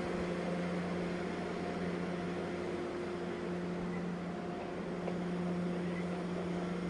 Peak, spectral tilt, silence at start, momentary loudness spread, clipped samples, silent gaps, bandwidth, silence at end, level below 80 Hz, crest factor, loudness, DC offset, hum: -24 dBFS; -7 dB/octave; 0 s; 3 LU; under 0.1%; none; 11 kHz; 0 s; -62 dBFS; 14 dB; -38 LUFS; under 0.1%; none